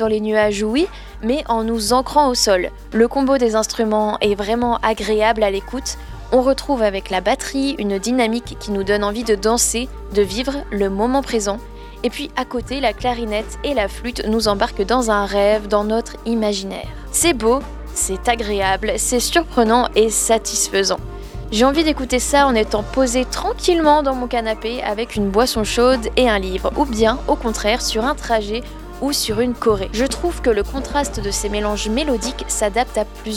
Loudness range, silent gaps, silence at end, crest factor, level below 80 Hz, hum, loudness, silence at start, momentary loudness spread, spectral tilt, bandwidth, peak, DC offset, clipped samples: 3 LU; none; 0 s; 18 dB; -32 dBFS; none; -18 LUFS; 0 s; 8 LU; -3.5 dB/octave; 17 kHz; 0 dBFS; under 0.1%; under 0.1%